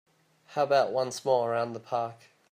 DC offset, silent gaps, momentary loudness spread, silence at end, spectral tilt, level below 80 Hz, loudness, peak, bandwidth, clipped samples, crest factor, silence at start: under 0.1%; none; 9 LU; 0.35 s; -4.5 dB/octave; -80 dBFS; -29 LUFS; -12 dBFS; 15.5 kHz; under 0.1%; 18 dB; 0.5 s